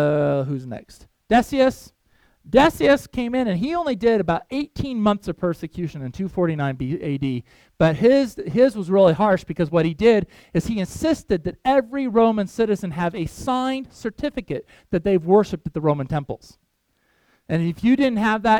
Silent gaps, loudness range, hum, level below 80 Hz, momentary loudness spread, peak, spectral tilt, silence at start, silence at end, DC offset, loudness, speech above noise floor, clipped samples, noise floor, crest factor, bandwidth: none; 5 LU; none; -46 dBFS; 11 LU; -2 dBFS; -7 dB/octave; 0 s; 0 s; under 0.1%; -21 LUFS; 47 dB; under 0.1%; -68 dBFS; 20 dB; 17 kHz